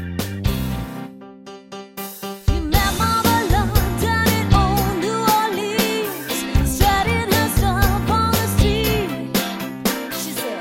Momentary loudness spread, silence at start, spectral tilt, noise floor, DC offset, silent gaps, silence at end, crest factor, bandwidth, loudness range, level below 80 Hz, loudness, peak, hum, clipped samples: 14 LU; 0 s; -4.5 dB/octave; -39 dBFS; under 0.1%; none; 0 s; 18 dB; 16.5 kHz; 3 LU; -26 dBFS; -19 LUFS; 0 dBFS; none; under 0.1%